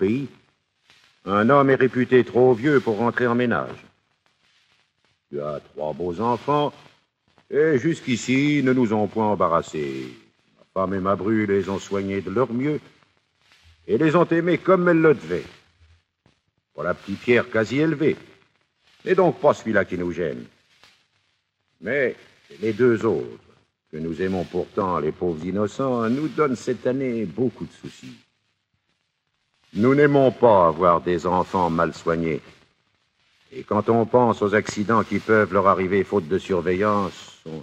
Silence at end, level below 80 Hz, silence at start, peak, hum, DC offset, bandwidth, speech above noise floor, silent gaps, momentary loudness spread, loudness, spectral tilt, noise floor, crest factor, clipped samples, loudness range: 0 s; -58 dBFS; 0 s; -2 dBFS; none; under 0.1%; 9 kHz; 52 dB; none; 14 LU; -21 LUFS; -7 dB/octave; -73 dBFS; 20 dB; under 0.1%; 7 LU